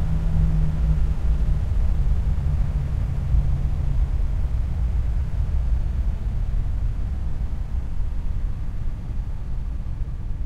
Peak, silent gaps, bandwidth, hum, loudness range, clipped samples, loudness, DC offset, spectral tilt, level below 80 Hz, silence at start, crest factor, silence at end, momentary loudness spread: -8 dBFS; none; 5.2 kHz; none; 6 LU; under 0.1%; -26 LUFS; under 0.1%; -8.5 dB/octave; -22 dBFS; 0 s; 14 dB; 0 s; 8 LU